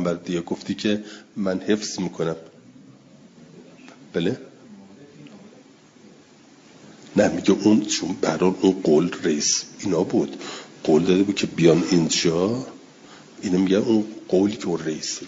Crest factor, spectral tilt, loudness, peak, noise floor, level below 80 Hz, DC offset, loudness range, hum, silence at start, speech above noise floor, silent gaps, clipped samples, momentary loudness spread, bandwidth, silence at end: 20 dB; -4.5 dB/octave; -22 LUFS; -4 dBFS; -50 dBFS; -62 dBFS; under 0.1%; 14 LU; none; 0 s; 29 dB; none; under 0.1%; 11 LU; 7.8 kHz; 0 s